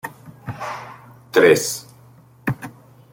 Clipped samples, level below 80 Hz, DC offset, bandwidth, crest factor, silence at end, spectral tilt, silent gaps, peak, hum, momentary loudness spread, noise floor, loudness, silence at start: under 0.1%; -58 dBFS; under 0.1%; 17 kHz; 20 dB; 0.4 s; -4 dB/octave; none; -2 dBFS; none; 23 LU; -48 dBFS; -20 LUFS; 0.05 s